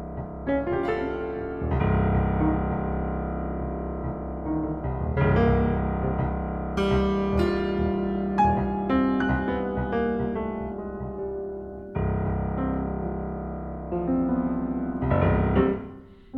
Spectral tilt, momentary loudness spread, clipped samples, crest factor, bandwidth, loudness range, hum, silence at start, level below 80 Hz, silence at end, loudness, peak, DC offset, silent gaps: -9.5 dB/octave; 10 LU; under 0.1%; 18 dB; 6.6 kHz; 5 LU; none; 0 s; -34 dBFS; 0 s; -26 LUFS; -8 dBFS; under 0.1%; none